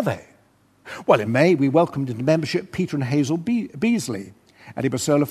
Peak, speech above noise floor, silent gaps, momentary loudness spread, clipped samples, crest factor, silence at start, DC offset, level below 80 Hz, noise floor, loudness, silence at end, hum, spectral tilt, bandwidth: -2 dBFS; 38 dB; none; 14 LU; under 0.1%; 20 dB; 0 s; under 0.1%; -60 dBFS; -58 dBFS; -21 LUFS; 0 s; none; -6 dB/octave; 13.5 kHz